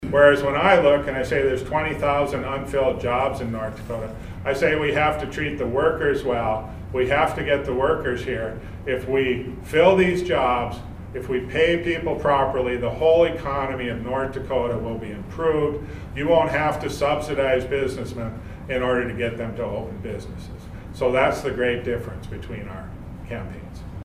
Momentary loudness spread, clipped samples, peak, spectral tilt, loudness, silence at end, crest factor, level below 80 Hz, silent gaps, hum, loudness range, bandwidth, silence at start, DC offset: 16 LU; under 0.1%; -2 dBFS; -6 dB/octave; -22 LUFS; 0 s; 20 dB; -40 dBFS; none; none; 5 LU; 15.5 kHz; 0 s; under 0.1%